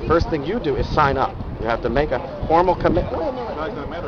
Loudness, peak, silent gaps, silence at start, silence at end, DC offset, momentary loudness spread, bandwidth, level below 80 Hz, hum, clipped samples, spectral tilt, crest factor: -21 LUFS; -2 dBFS; none; 0 s; 0 s; under 0.1%; 9 LU; 6.8 kHz; -32 dBFS; none; under 0.1%; -7.5 dB/octave; 18 dB